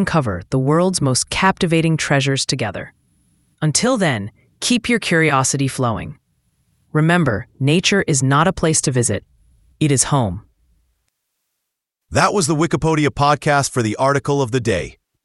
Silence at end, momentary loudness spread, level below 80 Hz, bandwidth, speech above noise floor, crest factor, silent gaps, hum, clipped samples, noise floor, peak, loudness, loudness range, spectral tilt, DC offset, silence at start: 0.35 s; 8 LU; -44 dBFS; 12 kHz; 62 dB; 18 dB; none; none; under 0.1%; -79 dBFS; 0 dBFS; -17 LUFS; 3 LU; -4.5 dB/octave; under 0.1%; 0 s